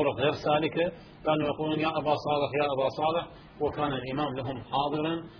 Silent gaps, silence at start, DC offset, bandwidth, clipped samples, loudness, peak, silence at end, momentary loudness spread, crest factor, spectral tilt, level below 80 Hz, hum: none; 0 s; under 0.1%; 5.4 kHz; under 0.1%; -29 LUFS; -12 dBFS; 0 s; 6 LU; 16 dB; -7.5 dB/octave; -56 dBFS; none